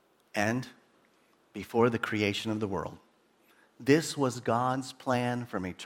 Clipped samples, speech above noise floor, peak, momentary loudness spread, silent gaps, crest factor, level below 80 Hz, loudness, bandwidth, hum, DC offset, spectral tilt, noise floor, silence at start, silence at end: under 0.1%; 37 dB; -10 dBFS; 11 LU; none; 22 dB; -66 dBFS; -30 LUFS; 17.5 kHz; none; under 0.1%; -5.5 dB/octave; -66 dBFS; 0.35 s; 0 s